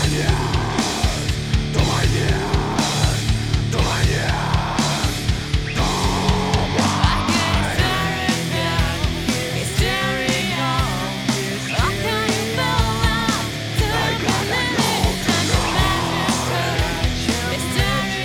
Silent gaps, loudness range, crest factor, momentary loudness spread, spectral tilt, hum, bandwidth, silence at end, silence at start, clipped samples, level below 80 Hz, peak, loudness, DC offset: none; 1 LU; 18 dB; 4 LU; -4.5 dB/octave; none; 18.5 kHz; 0 s; 0 s; under 0.1%; -28 dBFS; -2 dBFS; -20 LUFS; under 0.1%